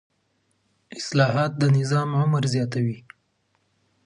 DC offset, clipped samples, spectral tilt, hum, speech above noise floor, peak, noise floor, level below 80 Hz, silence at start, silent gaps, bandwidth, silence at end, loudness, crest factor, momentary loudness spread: under 0.1%; under 0.1%; -6.5 dB/octave; none; 48 dB; -4 dBFS; -70 dBFS; -66 dBFS; 0.9 s; none; 10.5 kHz; 1.05 s; -23 LUFS; 20 dB; 12 LU